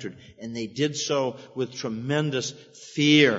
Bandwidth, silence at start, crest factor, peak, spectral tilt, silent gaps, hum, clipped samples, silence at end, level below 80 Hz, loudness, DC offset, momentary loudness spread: 8 kHz; 0 s; 22 dB; -4 dBFS; -4.5 dB/octave; none; none; under 0.1%; 0 s; -68 dBFS; -26 LUFS; under 0.1%; 15 LU